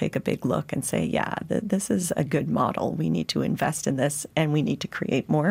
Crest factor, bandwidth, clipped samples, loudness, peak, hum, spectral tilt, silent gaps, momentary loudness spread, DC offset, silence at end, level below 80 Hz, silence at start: 14 dB; 16 kHz; under 0.1%; -26 LUFS; -10 dBFS; none; -5.5 dB/octave; none; 3 LU; under 0.1%; 0 s; -58 dBFS; 0 s